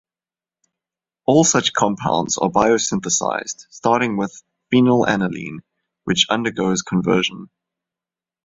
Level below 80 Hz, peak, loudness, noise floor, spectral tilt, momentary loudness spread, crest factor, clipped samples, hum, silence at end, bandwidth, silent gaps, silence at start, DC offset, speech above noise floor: -54 dBFS; -2 dBFS; -18 LUFS; under -90 dBFS; -3.5 dB/octave; 13 LU; 18 dB; under 0.1%; none; 1 s; 8 kHz; none; 1.3 s; under 0.1%; over 72 dB